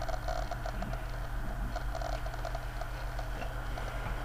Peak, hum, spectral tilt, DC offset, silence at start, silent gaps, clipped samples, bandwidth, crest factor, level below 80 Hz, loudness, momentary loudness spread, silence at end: -20 dBFS; none; -5.5 dB/octave; under 0.1%; 0 s; none; under 0.1%; 15.5 kHz; 16 dB; -38 dBFS; -39 LUFS; 3 LU; 0 s